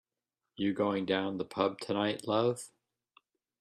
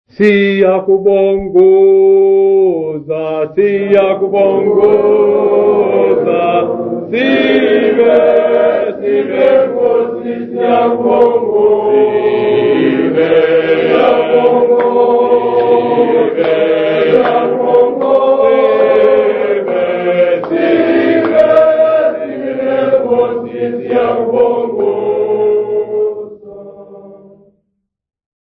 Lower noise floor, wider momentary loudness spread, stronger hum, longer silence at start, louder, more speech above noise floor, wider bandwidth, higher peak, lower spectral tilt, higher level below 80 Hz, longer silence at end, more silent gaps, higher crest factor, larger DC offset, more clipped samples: first, -90 dBFS vs -69 dBFS; about the same, 6 LU vs 7 LU; neither; first, 0.6 s vs 0.2 s; second, -33 LUFS vs -11 LUFS; about the same, 58 dB vs 59 dB; first, 13 kHz vs 5 kHz; second, -14 dBFS vs 0 dBFS; second, -5.5 dB/octave vs -8.5 dB/octave; second, -74 dBFS vs -50 dBFS; second, 0.95 s vs 1.35 s; neither; first, 20 dB vs 10 dB; neither; second, under 0.1% vs 0.1%